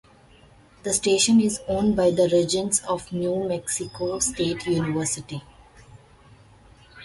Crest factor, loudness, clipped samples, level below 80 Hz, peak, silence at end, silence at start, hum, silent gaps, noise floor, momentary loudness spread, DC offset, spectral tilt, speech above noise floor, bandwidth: 18 dB; -23 LUFS; under 0.1%; -52 dBFS; -6 dBFS; 0 s; 0.85 s; none; none; -53 dBFS; 10 LU; under 0.1%; -4 dB/octave; 30 dB; 12 kHz